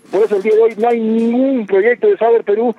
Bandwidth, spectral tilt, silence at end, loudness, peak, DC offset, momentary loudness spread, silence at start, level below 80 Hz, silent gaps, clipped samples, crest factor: 6.6 kHz; -7.5 dB/octave; 0.05 s; -13 LUFS; -2 dBFS; under 0.1%; 3 LU; 0.1 s; -80 dBFS; none; under 0.1%; 10 dB